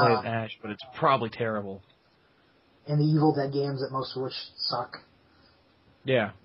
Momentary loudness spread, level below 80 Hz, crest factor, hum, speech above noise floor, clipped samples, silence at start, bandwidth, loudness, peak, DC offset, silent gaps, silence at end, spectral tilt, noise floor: 16 LU; -70 dBFS; 22 dB; none; 36 dB; under 0.1%; 0 s; 5.8 kHz; -28 LUFS; -8 dBFS; under 0.1%; none; 0.1 s; -5 dB/octave; -64 dBFS